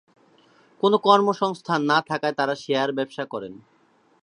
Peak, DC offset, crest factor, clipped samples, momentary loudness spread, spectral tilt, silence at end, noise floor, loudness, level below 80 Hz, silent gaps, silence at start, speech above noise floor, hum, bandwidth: -2 dBFS; under 0.1%; 22 dB; under 0.1%; 14 LU; -5.5 dB/octave; 0.7 s; -57 dBFS; -22 LUFS; -74 dBFS; none; 0.85 s; 35 dB; none; 10.5 kHz